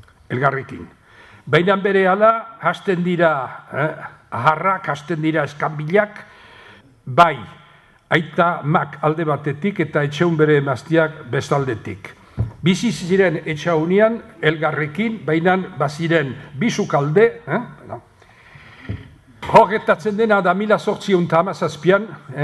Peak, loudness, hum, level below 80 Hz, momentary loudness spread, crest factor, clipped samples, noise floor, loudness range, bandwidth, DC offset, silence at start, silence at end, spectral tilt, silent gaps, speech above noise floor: 0 dBFS; -18 LUFS; none; -50 dBFS; 15 LU; 18 dB; under 0.1%; -49 dBFS; 3 LU; 12 kHz; under 0.1%; 0.3 s; 0 s; -6.5 dB/octave; none; 32 dB